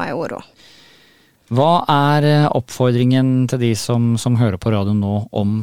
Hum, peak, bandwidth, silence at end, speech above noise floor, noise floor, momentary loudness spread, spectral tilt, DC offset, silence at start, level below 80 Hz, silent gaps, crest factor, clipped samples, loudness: none; -2 dBFS; 15.5 kHz; 0 s; 37 dB; -52 dBFS; 8 LU; -6.5 dB/octave; 0.6%; 0 s; -50 dBFS; none; 14 dB; under 0.1%; -16 LUFS